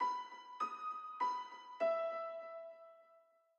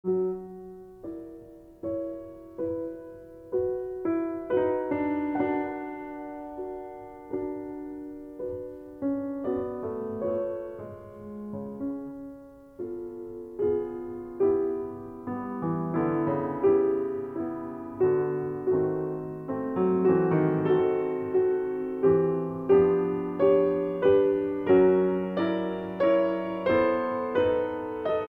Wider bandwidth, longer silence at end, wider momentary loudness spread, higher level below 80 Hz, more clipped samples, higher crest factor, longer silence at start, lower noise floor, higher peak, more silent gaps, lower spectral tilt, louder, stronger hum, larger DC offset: first, 8.2 kHz vs 4.5 kHz; first, 0.4 s vs 0.05 s; about the same, 15 LU vs 17 LU; second, under -90 dBFS vs -60 dBFS; neither; about the same, 16 dB vs 18 dB; about the same, 0 s vs 0.05 s; first, -70 dBFS vs -48 dBFS; second, -26 dBFS vs -10 dBFS; neither; second, -2 dB/octave vs -9.5 dB/octave; second, -42 LUFS vs -27 LUFS; neither; neither